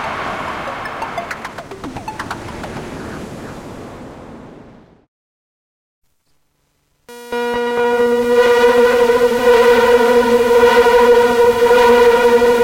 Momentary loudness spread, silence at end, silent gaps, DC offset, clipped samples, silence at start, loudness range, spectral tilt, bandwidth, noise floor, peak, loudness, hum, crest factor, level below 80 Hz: 20 LU; 0 s; 5.08-6.02 s; under 0.1%; under 0.1%; 0 s; 21 LU; -4 dB/octave; 16.5 kHz; -63 dBFS; -2 dBFS; -12 LUFS; none; 12 dB; -42 dBFS